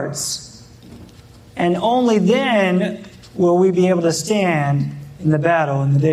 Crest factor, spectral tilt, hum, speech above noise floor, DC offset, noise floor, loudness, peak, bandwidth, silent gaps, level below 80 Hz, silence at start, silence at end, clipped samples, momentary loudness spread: 14 dB; -6 dB/octave; none; 27 dB; under 0.1%; -43 dBFS; -17 LUFS; -2 dBFS; 14 kHz; none; -54 dBFS; 0 s; 0 s; under 0.1%; 10 LU